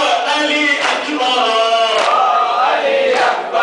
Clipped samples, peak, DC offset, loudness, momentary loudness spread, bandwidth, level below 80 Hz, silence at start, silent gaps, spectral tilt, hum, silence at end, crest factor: under 0.1%; -2 dBFS; under 0.1%; -13 LUFS; 2 LU; 10.5 kHz; -66 dBFS; 0 s; none; -1 dB/octave; none; 0 s; 12 dB